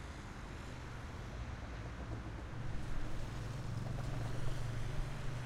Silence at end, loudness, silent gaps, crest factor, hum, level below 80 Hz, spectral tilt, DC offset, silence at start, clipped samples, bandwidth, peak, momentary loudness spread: 0 s; -45 LUFS; none; 14 dB; none; -46 dBFS; -6 dB/octave; under 0.1%; 0 s; under 0.1%; 12.5 kHz; -26 dBFS; 6 LU